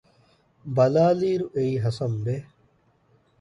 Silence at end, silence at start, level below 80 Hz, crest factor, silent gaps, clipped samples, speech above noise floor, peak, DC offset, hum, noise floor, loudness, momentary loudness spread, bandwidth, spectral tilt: 0.95 s; 0.65 s; -60 dBFS; 18 dB; none; under 0.1%; 40 dB; -8 dBFS; under 0.1%; none; -63 dBFS; -24 LUFS; 12 LU; 11 kHz; -8.5 dB/octave